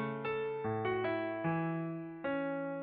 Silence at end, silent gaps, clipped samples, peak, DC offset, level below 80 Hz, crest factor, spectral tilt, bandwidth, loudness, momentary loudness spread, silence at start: 0 s; none; under 0.1%; -24 dBFS; under 0.1%; -70 dBFS; 14 dB; -6 dB/octave; 4.8 kHz; -37 LUFS; 4 LU; 0 s